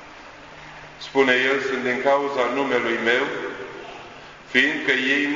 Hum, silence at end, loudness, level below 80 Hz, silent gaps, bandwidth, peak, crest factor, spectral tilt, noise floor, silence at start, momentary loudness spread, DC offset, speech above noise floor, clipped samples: none; 0 s; -21 LUFS; -60 dBFS; none; 7.6 kHz; -2 dBFS; 20 dB; -3.5 dB/octave; -42 dBFS; 0 s; 22 LU; under 0.1%; 21 dB; under 0.1%